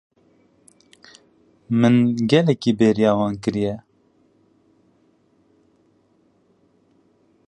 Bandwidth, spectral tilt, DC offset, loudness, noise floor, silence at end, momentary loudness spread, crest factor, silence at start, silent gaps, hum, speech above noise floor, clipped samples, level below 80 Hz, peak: 9.6 kHz; -7 dB/octave; under 0.1%; -19 LUFS; -61 dBFS; 3.7 s; 9 LU; 20 dB; 1.7 s; none; none; 43 dB; under 0.1%; -58 dBFS; -4 dBFS